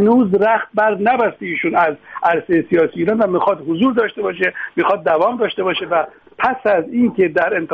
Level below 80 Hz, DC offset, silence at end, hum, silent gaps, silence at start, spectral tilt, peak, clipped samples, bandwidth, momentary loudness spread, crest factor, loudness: -58 dBFS; under 0.1%; 0 s; none; none; 0 s; -8 dB/octave; -2 dBFS; under 0.1%; 5.4 kHz; 5 LU; 14 dB; -16 LUFS